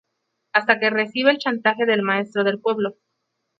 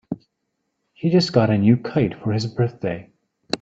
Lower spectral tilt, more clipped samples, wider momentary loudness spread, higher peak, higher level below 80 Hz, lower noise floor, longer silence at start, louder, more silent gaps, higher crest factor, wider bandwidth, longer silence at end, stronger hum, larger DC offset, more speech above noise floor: about the same, -6 dB/octave vs -7 dB/octave; neither; second, 5 LU vs 15 LU; about the same, 0 dBFS vs -2 dBFS; second, -74 dBFS vs -56 dBFS; about the same, -76 dBFS vs -75 dBFS; first, 0.55 s vs 0.1 s; about the same, -20 LUFS vs -20 LUFS; neither; about the same, 22 dB vs 20 dB; second, 7.6 kHz vs 8.6 kHz; first, 0.7 s vs 0.05 s; neither; neither; about the same, 56 dB vs 56 dB